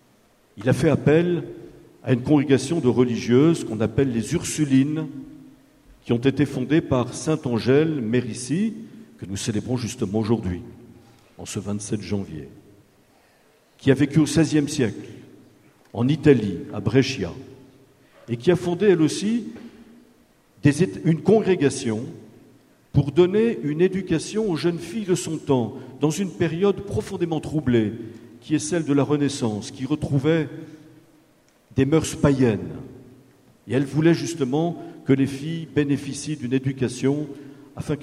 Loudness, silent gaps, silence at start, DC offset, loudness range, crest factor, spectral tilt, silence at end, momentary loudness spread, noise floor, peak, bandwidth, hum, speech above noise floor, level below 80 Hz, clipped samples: -22 LUFS; none; 0.55 s; under 0.1%; 4 LU; 20 dB; -6.5 dB/octave; 0 s; 16 LU; -58 dBFS; -2 dBFS; 13.5 kHz; none; 37 dB; -52 dBFS; under 0.1%